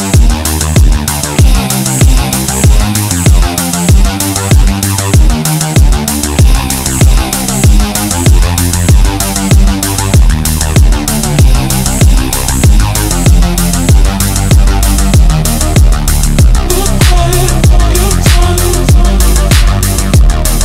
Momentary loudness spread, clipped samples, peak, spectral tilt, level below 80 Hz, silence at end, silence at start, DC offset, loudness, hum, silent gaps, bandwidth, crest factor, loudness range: 3 LU; 2%; 0 dBFS; -4.5 dB/octave; -10 dBFS; 0 s; 0 s; under 0.1%; -9 LUFS; none; none; 16.5 kHz; 6 dB; 1 LU